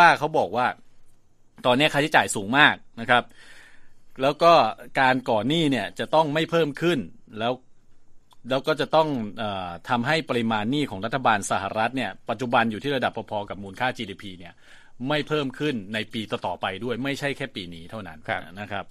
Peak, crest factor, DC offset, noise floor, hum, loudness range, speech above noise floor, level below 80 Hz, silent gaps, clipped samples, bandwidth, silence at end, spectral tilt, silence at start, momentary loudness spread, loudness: 0 dBFS; 24 dB; under 0.1%; -52 dBFS; none; 8 LU; 28 dB; -56 dBFS; none; under 0.1%; 14.5 kHz; 0 s; -4.5 dB/octave; 0 s; 14 LU; -24 LUFS